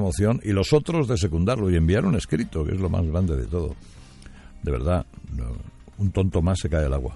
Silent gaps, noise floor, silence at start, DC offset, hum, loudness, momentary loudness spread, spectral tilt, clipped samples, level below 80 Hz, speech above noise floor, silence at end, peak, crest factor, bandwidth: none; -44 dBFS; 0 s; under 0.1%; none; -24 LUFS; 13 LU; -7 dB/octave; under 0.1%; -34 dBFS; 21 dB; 0 s; -6 dBFS; 18 dB; 11.5 kHz